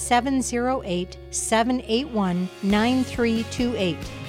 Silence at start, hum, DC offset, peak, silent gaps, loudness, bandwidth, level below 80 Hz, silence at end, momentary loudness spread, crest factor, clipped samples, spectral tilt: 0 s; none; under 0.1%; -8 dBFS; none; -24 LUFS; 16 kHz; -44 dBFS; 0 s; 6 LU; 16 dB; under 0.1%; -4.5 dB/octave